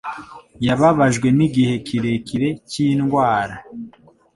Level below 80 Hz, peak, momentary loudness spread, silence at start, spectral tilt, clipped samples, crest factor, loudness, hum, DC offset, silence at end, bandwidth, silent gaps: -50 dBFS; -2 dBFS; 19 LU; 0.05 s; -6.5 dB/octave; under 0.1%; 18 dB; -18 LUFS; none; under 0.1%; 0.45 s; 11.5 kHz; none